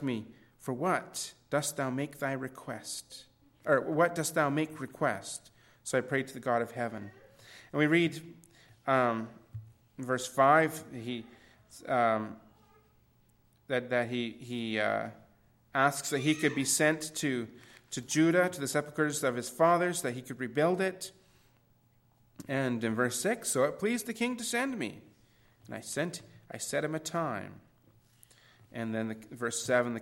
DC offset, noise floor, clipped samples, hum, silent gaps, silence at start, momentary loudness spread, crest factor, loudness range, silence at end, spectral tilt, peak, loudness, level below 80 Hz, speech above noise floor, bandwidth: under 0.1%; -67 dBFS; under 0.1%; none; none; 0 s; 17 LU; 22 dB; 6 LU; 0 s; -4 dB/octave; -12 dBFS; -31 LUFS; -72 dBFS; 36 dB; 16 kHz